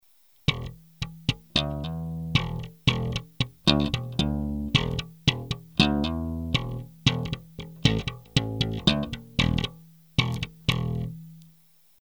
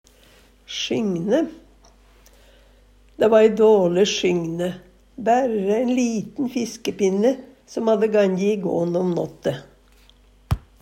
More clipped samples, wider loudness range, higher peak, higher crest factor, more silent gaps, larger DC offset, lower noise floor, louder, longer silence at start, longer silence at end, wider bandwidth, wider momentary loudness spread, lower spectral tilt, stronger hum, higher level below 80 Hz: neither; about the same, 2 LU vs 4 LU; about the same, -2 dBFS vs -2 dBFS; first, 26 dB vs 20 dB; neither; neither; first, -60 dBFS vs -53 dBFS; second, -27 LUFS vs -21 LUFS; second, 0.5 s vs 0.7 s; first, 0.55 s vs 0.25 s; first, over 20 kHz vs 15.5 kHz; about the same, 11 LU vs 13 LU; about the same, -5.5 dB/octave vs -5.5 dB/octave; neither; first, -40 dBFS vs -46 dBFS